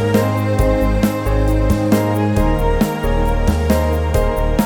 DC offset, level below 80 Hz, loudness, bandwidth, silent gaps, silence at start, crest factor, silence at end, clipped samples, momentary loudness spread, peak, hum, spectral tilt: under 0.1%; -20 dBFS; -17 LUFS; over 20 kHz; none; 0 s; 14 dB; 0 s; under 0.1%; 2 LU; -2 dBFS; none; -7 dB/octave